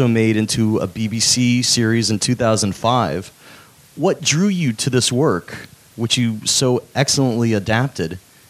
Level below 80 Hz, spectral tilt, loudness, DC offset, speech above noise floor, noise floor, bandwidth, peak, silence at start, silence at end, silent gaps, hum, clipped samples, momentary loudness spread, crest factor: -52 dBFS; -4 dB/octave; -17 LUFS; under 0.1%; 27 dB; -44 dBFS; 15.5 kHz; 0 dBFS; 0 s; 0.3 s; none; none; under 0.1%; 9 LU; 18 dB